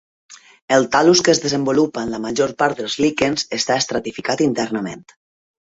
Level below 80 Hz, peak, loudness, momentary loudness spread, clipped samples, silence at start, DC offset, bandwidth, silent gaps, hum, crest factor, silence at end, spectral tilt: -54 dBFS; 0 dBFS; -18 LUFS; 10 LU; under 0.1%; 0.3 s; under 0.1%; 8 kHz; 0.62-0.68 s; none; 18 dB; 0.6 s; -3.5 dB/octave